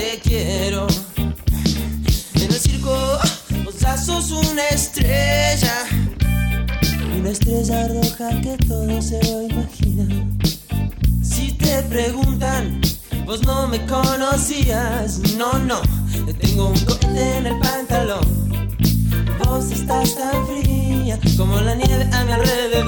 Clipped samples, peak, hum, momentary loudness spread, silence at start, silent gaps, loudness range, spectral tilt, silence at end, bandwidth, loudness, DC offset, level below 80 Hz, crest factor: under 0.1%; -2 dBFS; none; 4 LU; 0 s; none; 2 LU; -5 dB/octave; 0 s; over 20 kHz; -19 LUFS; under 0.1%; -24 dBFS; 16 dB